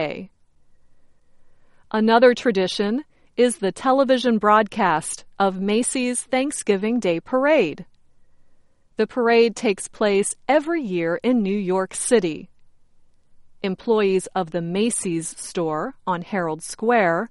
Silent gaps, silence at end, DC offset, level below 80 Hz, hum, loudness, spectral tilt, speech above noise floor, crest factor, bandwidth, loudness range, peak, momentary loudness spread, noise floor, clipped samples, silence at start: none; 0.05 s; under 0.1%; -58 dBFS; none; -21 LUFS; -4.5 dB/octave; 33 dB; 18 dB; 11.5 kHz; 4 LU; -4 dBFS; 10 LU; -53 dBFS; under 0.1%; 0 s